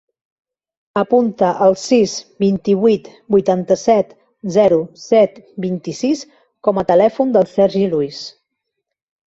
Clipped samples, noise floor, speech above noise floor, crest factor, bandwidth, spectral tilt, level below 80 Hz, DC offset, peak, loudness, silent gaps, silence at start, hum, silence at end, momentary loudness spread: under 0.1%; -77 dBFS; 62 dB; 16 dB; 8 kHz; -6 dB/octave; -56 dBFS; under 0.1%; -2 dBFS; -16 LUFS; none; 0.95 s; none; 1 s; 10 LU